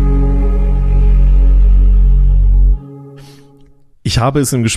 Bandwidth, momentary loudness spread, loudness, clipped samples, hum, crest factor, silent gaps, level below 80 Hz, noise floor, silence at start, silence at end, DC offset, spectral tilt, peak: 12.5 kHz; 8 LU; -13 LUFS; under 0.1%; none; 8 dB; none; -10 dBFS; -43 dBFS; 0 s; 0 s; under 0.1%; -5.5 dB/octave; -2 dBFS